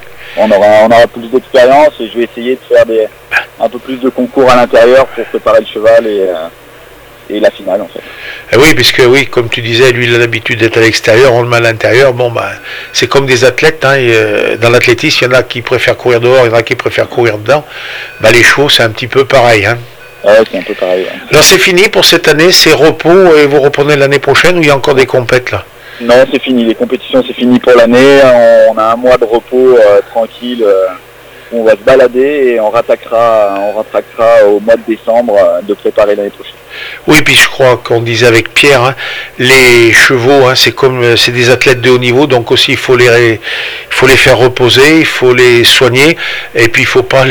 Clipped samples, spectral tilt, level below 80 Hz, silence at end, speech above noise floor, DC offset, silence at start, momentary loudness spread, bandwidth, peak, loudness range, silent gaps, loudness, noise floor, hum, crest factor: 6%; -4 dB/octave; -38 dBFS; 0 s; 27 dB; under 0.1%; 0 s; 11 LU; over 20 kHz; 0 dBFS; 4 LU; none; -6 LUFS; -33 dBFS; none; 6 dB